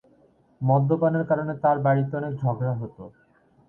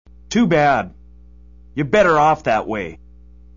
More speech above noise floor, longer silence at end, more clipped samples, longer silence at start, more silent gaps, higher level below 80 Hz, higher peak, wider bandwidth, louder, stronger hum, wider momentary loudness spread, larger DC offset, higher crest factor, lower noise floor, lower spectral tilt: first, 36 dB vs 28 dB; about the same, 0.6 s vs 0.6 s; neither; first, 0.6 s vs 0.3 s; neither; second, -62 dBFS vs -44 dBFS; second, -8 dBFS vs -4 dBFS; second, 3.5 kHz vs 7.4 kHz; second, -24 LUFS vs -17 LUFS; second, none vs 60 Hz at -45 dBFS; second, 8 LU vs 16 LU; second, under 0.1% vs 0.4%; about the same, 16 dB vs 16 dB; first, -59 dBFS vs -44 dBFS; first, -12 dB/octave vs -6 dB/octave